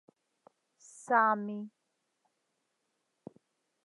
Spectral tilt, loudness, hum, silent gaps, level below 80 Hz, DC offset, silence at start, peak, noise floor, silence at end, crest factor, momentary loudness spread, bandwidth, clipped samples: -6 dB/octave; -30 LUFS; none; none; under -90 dBFS; under 0.1%; 0.95 s; -12 dBFS; -81 dBFS; 2.2 s; 24 dB; 22 LU; 11.5 kHz; under 0.1%